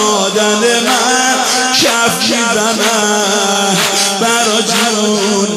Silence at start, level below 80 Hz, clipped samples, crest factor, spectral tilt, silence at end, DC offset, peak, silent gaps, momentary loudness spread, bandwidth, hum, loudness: 0 s; -56 dBFS; under 0.1%; 12 dB; -1.5 dB/octave; 0 s; under 0.1%; 0 dBFS; none; 2 LU; 15.5 kHz; none; -10 LUFS